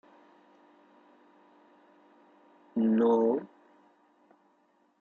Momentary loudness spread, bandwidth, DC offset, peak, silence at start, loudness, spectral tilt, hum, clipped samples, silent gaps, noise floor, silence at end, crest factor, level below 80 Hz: 13 LU; 4 kHz; under 0.1%; -16 dBFS; 2.75 s; -27 LUFS; -9 dB/octave; none; under 0.1%; none; -69 dBFS; 1.55 s; 18 dB; -84 dBFS